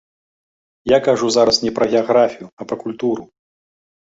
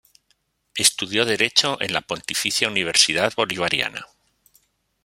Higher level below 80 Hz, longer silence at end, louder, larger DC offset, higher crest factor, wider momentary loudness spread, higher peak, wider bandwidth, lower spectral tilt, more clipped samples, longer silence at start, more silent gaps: first, -54 dBFS vs -62 dBFS; about the same, 0.9 s vs 1 s; first, -17 LUFS vs -20 LUFS; neither; second, 18 dB vs 24 dB; first, 13 LU vs 9 LU; about the same, -2 dBFS vs 0 dBFS; second, 8 kHz vs 16.5 kHz; first, -4 dB/octave vs -1 dB/octave; neither; about the same, 0.85 s vs 0.75 s; first, 2.53-2.57 s vs none